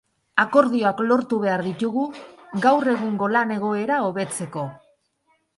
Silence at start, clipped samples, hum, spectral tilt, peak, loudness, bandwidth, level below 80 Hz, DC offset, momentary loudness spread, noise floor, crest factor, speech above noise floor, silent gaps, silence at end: 0.35 s; under 0.1%; none; -5.5 dB/octave; 0 dBFS; -22 LUFS; 11.5 kHz; -68 dBFS; under 0.1%; 12 LU; -67 dBFS; 22 dB; 46 dB; none; 0.8 s